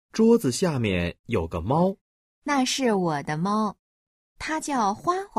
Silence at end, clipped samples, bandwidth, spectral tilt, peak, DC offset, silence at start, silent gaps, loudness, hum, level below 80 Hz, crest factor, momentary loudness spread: 0 s; under 0.1%; 15.5 kHz; -5 dB/octave; -8 dBFS; under 0.1%; 0.15 s; 1.19-1.24 s, 2.01-2.42 s, 3.79-4.36 s; -25 LUFS; none; -50 dBFS; 18 dB; 10 LU